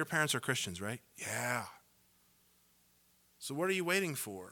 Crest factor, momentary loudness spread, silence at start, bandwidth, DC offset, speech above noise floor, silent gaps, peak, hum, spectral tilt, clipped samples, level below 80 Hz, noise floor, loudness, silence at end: 22 dB; 11 LU; 0 s; 19 kHz; under 0.1%; 33 dB; none; -16 dBFS; 60 Hz at -70 dBFS; -3 dB/octave; under 0.1%; -76 dBFS; -70 dBFS; -36 LUFS; 0 s